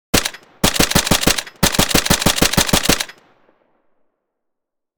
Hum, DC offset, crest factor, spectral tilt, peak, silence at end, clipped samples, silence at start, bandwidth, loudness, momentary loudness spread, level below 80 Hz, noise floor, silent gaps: none; under 0.1%; 18 dB; -2.5 dB/octave; 0 dBFS; 1.85 s; under 0.1%; 0.15 s; over 20 kHz; -15 LUFS; 6 LU; -32 dBFS; -76 dBFS; none